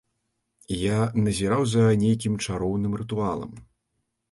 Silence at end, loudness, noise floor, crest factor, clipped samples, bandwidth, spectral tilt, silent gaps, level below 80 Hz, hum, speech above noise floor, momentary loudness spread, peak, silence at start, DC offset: 0.7 s; -25 LUFS; -77 dBFS; 14 dB; under 0.1%; 11.5 kHz; -6.5 dB/octave; none; -48 dBFS; none; 54 dB; 9 LU; -10 dBFS; 0.7 s; under 0.1%